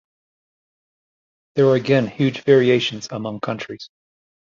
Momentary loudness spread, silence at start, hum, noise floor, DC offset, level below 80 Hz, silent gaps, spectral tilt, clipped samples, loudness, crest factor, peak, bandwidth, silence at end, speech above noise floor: 14 LU; 1.55 s; none; under -90 dBFS; under 0.1%; -62 dBFS; none; -6.5 dB/octave; under 0.1%; -19 LUFS; 18 dB; -2 dBFS; 7.4 kHz; 0.6 s; over 72 dB